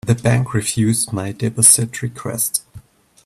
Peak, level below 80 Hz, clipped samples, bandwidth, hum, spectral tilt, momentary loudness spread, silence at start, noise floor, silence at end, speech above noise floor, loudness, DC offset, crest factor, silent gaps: 0 dBFS; -50 dBFS; under 0.1%; 15.5 kHz; none; -4 dB/octave; 14 LU; 0.05 s; -43 dBFS; 0.45 s; 26 dB; -16 LUFS; under 0.1%; 18 dB; none